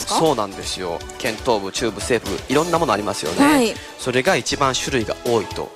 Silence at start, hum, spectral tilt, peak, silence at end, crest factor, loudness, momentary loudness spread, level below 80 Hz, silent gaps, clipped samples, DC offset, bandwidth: 0 s; none; -3.5 dB/octave; -4 dBFS; 0 s; 16 dB; -20 LUFS; 8 LU; -42 dBFS; none; under 0.1%; under 0.1%; 15.5 kHz